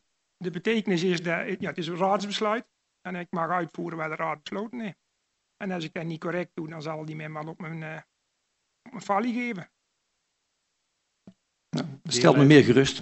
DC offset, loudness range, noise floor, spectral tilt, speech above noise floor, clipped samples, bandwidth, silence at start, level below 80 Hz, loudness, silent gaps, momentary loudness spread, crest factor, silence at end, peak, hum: under 0.1%; 8 LU; -77 dBFS; -5.5 dB/octave; 52 dB; under 0.1%; 8.2 kHz; 0.4 s; -64 dBFS; -26 LUFS; none; 17 LU; 26 dB; 0 s; -2 dBFS; none